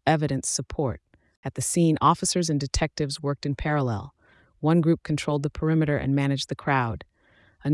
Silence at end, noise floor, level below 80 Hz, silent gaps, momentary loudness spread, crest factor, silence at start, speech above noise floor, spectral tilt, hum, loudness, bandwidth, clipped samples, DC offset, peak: 0 s; -60 dBFS; -44 dBFS; 1.37-1.43 s; 11 LU; 18 dB; 0.05 s; 36 dB; -5 dB/octave; none; -25 LUFS; 12 kHz; under 0.1%; under 0.1%; -6 dBFS